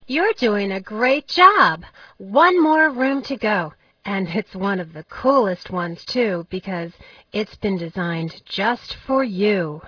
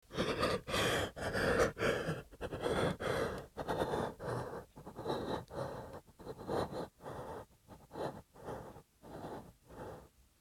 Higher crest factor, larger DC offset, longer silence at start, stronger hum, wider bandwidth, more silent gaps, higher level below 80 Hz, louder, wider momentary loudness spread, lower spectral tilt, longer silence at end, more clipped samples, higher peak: about the same, 20 dB vs 20 dB; neither; about the same, 0.1 s vs 0.1 s; neither; second, 5.4 kHz vs 18 kHz; neither; about the same, -56 dBFS vs -56 dBFS; first, -20 LUFS vs -38 LUFS; second, 13 LU vs 18 LU; first, -6.5 dB/octave vs -4.5 dB/octave; second, 0 s vs 0.35 s; neither; first, 0 dBFS vs -20 dBFS